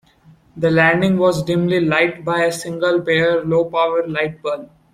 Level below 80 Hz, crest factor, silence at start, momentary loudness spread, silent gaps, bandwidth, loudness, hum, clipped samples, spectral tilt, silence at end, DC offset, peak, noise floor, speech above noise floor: -52 dBFS; 16 dB; 0.55 s; 8 LU; none; 15 kHz; -17 LUFS; none; under 0.1%; -6 dB/octave; 0.3 s; under 0.1%; -2 dBFS; -50 dBFS; 33 dB